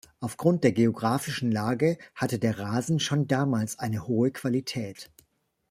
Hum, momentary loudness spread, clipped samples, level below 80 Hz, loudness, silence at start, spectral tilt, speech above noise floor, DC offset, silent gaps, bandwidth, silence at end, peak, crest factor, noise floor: none; 9 LU; under 0.1%; -64 dBFS; -27 LUFS; 0.2 s; -6 dB/octave; 44 dB; under 0.1%; none; 16 kHz; 0.65 s; -8 dBFS; 20 dB; -70 dBFS